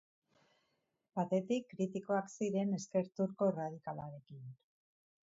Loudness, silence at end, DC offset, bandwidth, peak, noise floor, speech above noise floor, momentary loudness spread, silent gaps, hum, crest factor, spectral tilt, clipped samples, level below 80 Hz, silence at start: -38 LUFS; 0.75 s; under 0.1%; 7.6 kHz; -22 dBFS; -82 dBFS; 45 dB; 16 LU; none; none; 18 dB; -7.5 dB/octave; under 0.1%; -82 dBFS; 1.15 s